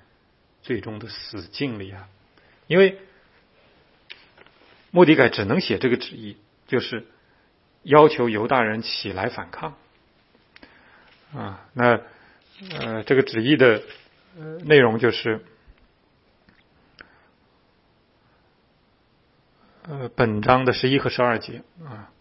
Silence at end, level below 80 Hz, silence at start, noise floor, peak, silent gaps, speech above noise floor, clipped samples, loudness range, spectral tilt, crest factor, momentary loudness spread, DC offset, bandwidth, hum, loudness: 0.15 s; -58 dBFS; 0.7 s; -62 dBFS; 0 dBFS; none; 41 dB; under 0.1%; 8 LU; -9.5 dB/octave; 24 dB; 23 LU; under 0.1%; 5.8 kHz; none; -20 LUFS